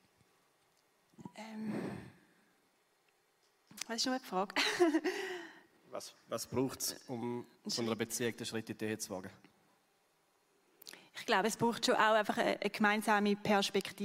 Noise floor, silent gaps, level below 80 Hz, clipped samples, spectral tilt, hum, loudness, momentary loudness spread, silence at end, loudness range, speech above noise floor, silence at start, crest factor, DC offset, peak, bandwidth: -74 dBFS; none; -78 dBFS; under 0.1%; -3.5 dB/octave; none; -35 LUFS; 19 LU; 0 s; 12 LU; 39 dB; 1.2 s; 22 dB; under 0.1%; -14 dBFS; 16 kHz